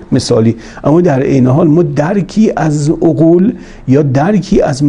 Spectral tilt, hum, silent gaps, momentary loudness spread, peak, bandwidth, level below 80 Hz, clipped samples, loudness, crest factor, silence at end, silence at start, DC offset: -7.5 dB/octave; none; none; 5 LU; 0 dBFS; 10.5 kHz; -34 dBFS; 0.2%; -10 LUFS; 10 dB; 0 s; 0 s; under 0.1%